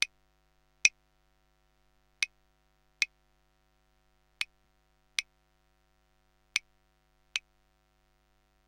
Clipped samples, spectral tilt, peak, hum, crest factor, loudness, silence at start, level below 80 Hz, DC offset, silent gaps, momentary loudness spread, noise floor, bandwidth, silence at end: under 0.1%; 3.5 dB/octave; -2 dBFS; none; 38 dB; -33 LUFS; 0 s; -72 dBFS; under 0.1%; none; 11 LU; -71 dBFS; 16 kHz; 1.3 s